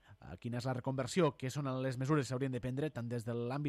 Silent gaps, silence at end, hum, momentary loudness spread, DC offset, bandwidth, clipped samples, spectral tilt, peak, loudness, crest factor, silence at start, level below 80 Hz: none; 0 s; none; 7 LU; under 0.1%; 13.5 kHz; under 0.1%; -6.5 dB/octave; -20 dBFS; -37 LUFS; 18 dB; 0.1 s; -66 dBFS